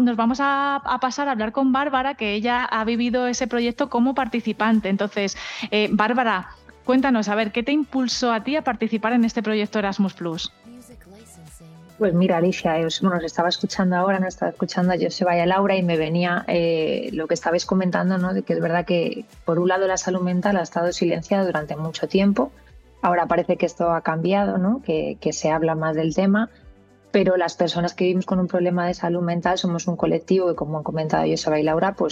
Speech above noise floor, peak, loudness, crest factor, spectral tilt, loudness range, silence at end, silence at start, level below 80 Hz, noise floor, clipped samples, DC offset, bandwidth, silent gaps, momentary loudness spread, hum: 28 dB; -4 dBFS; -22 LUFS; 16 dB; -5.5 dB/octave; 2 LU; 0 s; 0 s; -52 dBFS; -49 dBFS; under 0.1%; under 0.1%; 9.4 kHz; none; 5 LU; none